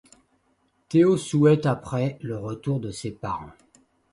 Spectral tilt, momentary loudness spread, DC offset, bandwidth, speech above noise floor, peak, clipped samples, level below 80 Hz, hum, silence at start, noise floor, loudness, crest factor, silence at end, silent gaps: -7.5 dB/octave; 13 LU; under 0.1%; 11.5 kHz; 45 dB; -6 dBFS; under 0.1%; -56 dBFS; none; 0.9 s; -68 dBFS; -24 LUFS; 18 dB; 0.6 s; none